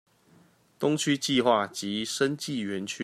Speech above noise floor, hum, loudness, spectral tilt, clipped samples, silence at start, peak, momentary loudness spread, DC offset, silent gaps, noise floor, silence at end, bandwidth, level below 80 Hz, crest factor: 33 dB; none; -27 LUFS; -4 dB/octave; under 0.1%; 0.8 s; -8 dBFS; 8 LU; under 0.1%; none; -60 dBFS; 0 s; 14 kHz; -72 dBFS; 20 dB